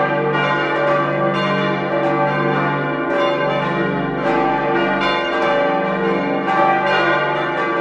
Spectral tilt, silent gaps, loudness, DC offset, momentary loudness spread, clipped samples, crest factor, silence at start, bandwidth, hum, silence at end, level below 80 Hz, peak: -6.5 dB/octave; none; -17 LUFS; under 0.1%; 3 LU; under 0.1%; 16 dB; 0 s; 8.6 kHz; none; 0 s; -50 dBFS; -2 dBFS